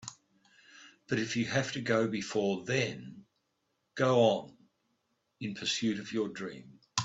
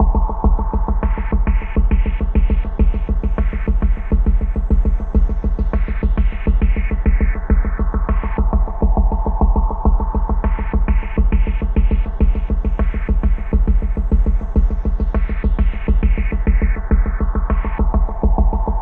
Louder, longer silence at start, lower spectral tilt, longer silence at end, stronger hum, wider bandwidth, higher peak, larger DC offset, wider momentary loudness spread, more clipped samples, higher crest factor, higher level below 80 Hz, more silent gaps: second, -32 LUFS vs -19 LUFS; about the same, 0 s vs 0 s; second, -4.5 dB/octave vs -11 dB/octave; about the same, 0 s vs 0 s; neither; first, 8.4 kHz vs 3.1 kHz; second, -10 dBFS vs -2 dBFS; neither; first, 17 LU vs 3 LU; neither; first, 24 dB vs 12 dB; second, -72 dBFS vs -16 dBFS; neither